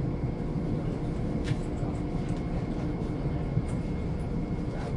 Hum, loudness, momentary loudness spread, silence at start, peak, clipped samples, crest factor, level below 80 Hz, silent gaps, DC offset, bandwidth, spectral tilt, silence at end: none; -32 LUFS; 2 LU; 0 s; -16 dBFS; under 0.1%; 16 dB; -36 dBFS; none; under 0.1%; 11 kHz; -8.5 dB/octave; 0 s